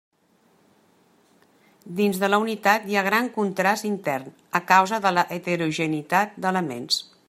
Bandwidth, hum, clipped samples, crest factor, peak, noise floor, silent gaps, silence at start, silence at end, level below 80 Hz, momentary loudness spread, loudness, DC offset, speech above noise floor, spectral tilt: 16 kHz; none; under 0.1%; 22 dB; -2 dBFS; -62 dBFS; none; 1.85 s; 0.25 s; -72 dBFS; 9 LU; -23 LUFS; under 0.1%; 39 dB; -4.5 dB/octave